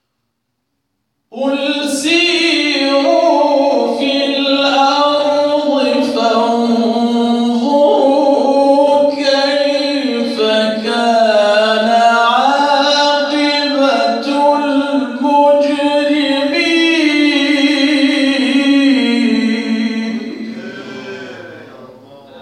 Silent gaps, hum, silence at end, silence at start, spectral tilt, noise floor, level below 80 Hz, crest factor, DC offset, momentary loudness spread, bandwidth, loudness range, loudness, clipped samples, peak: none; none; 0 s; 1.35 s; -3.5 dB/octave; -70 dBFS; -66 dBFS; 12 dB; under 0.1%; 6 LU; 12 kHz; 2 LU; -12 LUFS; under 0.1%; 0 dBFS